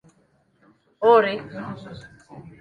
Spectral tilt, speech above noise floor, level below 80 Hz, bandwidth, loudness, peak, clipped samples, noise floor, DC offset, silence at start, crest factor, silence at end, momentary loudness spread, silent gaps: -6.5 dB/octave; 42 dB; -62 dBFS; 7 kHz; -19 LUFS; -4 dBFS; under 0.1%; -63 dBFS; under 0.1%; 1 s; 20 dB; 0.1 s; 24 LU; none